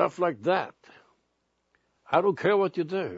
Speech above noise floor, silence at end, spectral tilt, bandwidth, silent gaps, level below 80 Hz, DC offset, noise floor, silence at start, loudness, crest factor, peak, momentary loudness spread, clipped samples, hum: 49 dB; 0 s; -7 dB/octave; 7.8 kHz; none; -74 dBFS; under 0.1%; -75 dBFS; 0 s; -26 LUFS; 20 dB; -8 dBFS; 5 LU; under 0.1%; none